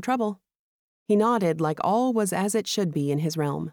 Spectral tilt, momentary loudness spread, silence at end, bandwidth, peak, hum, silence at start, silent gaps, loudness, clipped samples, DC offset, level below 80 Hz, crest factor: -5.5 dB/octave; 6 LU; 0 s; 19.5 kHz; -12 dBFS; none; 0 s; 0.59-1.06 s; -25 LUFS; under 0.1%; under 0.1%; -70 dBFS; 14 dB